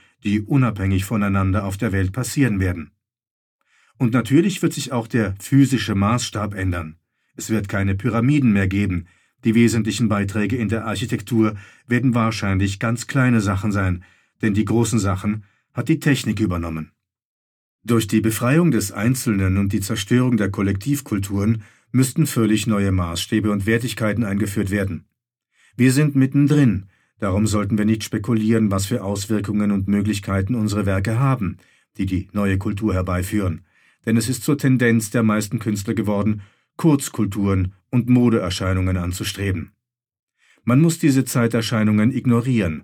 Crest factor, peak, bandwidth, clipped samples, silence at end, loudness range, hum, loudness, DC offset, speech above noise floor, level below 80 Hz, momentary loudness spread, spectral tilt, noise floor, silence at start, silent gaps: 16 dB; -4 dBFS; 17.5 kHz; under 0.1%; 0 s; 2 LU; none; -20 LUFS; under 0.1%; 52 dB; -48 dBFS; 8 LU; -6 dB/octave; -71 dBFS; 0.25 s; 3.31-3.59 s, 17.25-17.79 s, 40.19-40.27 s